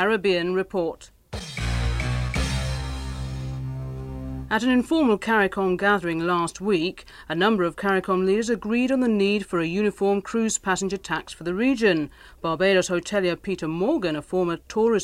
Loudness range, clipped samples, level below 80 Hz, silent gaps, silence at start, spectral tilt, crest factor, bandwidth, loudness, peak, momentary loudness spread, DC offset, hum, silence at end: 5 LU; under 0.1%; -38 dBFS; none; 0 s; -5 dB/octave; 16 dB; 15.5 kHz; -24 LUFS; -8 dBFS; 11 LU; under 0.1%; none; 0 s